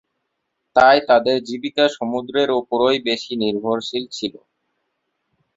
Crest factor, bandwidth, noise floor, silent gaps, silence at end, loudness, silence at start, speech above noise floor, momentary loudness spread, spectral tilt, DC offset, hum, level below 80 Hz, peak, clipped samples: 18 dB; 7.8 kHz; -75 dBFS; none; 1.25 s; -18 LUFS; 0.75 s; 57 dB; 12 LU; -4.5 dB/octave; under 0.1%; none; -60 dBFS; -2 dBFS; under 0.1%